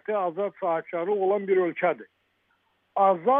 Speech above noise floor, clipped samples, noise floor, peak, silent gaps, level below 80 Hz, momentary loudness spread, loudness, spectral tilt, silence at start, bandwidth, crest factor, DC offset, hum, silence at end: 46 dB; under 0.1%; -70 dBFS; -8 dBFS; none; -88 dBFS; 6 LU; -26 LUFS; -10 dB/octave; 0.1 s; 3.7 kHz; 16 dB; under 0.1%; none; 0 s